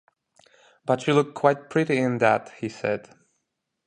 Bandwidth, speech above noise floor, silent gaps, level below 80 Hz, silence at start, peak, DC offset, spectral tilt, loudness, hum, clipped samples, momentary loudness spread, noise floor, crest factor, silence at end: 10 kHz; 56 dB; none; -68 dBFS; 0.85 s; -4 dBFS; under 0.1%; -6.5 dB/octave; -24 LUFS; none; under 0.1%; 10 LU; -79 dBFS; 22 dB; 0.85 s